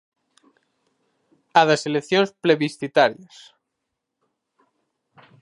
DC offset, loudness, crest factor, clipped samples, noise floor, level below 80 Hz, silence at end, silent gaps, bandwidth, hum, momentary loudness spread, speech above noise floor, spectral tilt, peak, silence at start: under 0.1%; -20 LUFS; 24 dB; under 0.1%; -80 dBFS; -76 dBFS; 2.3 s; none; 11.5 kHz; none; 5 LU; 60 dB; -4.5 dB/octave; -2 dBFS; 1.55 s